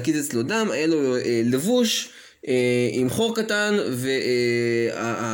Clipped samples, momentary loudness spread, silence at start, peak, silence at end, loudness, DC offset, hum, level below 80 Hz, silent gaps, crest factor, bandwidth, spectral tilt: under 0.1%; 5 LU; 0 s; -10 dBFS; 0 s; -22 LUFS; under 0.1%; none; -64 dBFS; none; 12 dB; 17 kHz; -4.5 dB/octave